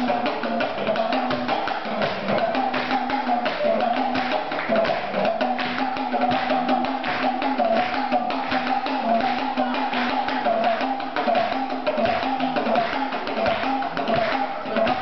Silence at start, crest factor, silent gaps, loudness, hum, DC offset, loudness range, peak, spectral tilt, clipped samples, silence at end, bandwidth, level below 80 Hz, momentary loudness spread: 0 s; 12 dB; none; -23 LUFS; none; 1%; 1 LU; -10 dBFS; -6 dB/octave; under 0.1%; 0 s; 6.2 kHz; -58 dBFS; 3 LU